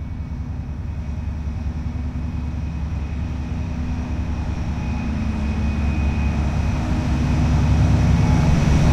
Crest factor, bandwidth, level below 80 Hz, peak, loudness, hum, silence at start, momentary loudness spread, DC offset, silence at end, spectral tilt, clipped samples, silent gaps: 16 dB; 8.6 kHz; -24 dBFS; -4 dBFS; -22 LUFS; none; 0 s; 11 LU; under 0.1%; 0 s; -7.5 dB/octave; under 0.1%; none